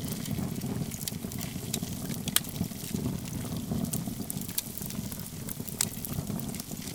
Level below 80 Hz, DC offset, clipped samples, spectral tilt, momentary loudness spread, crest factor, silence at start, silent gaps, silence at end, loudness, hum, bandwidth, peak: -52 dBFS; under 0.1%; under 0.1%; -4 dB/octave; 7 LU; 34 dB; 0 s; none; 0 s; -34 LUFS; none; 19 kHz; 0 dBFS